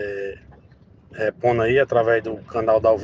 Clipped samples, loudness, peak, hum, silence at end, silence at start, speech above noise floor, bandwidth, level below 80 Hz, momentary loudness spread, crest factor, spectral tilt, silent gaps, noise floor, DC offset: under 0.1%; -21 LUFS; -6 dBFS; none; 0 s; 0 s; 31 dB; 7.4 kHz; -50 dBFS; 13 LU; 16 dB; -7.5 dB/octave; none; -50 dBFS; under 0.1%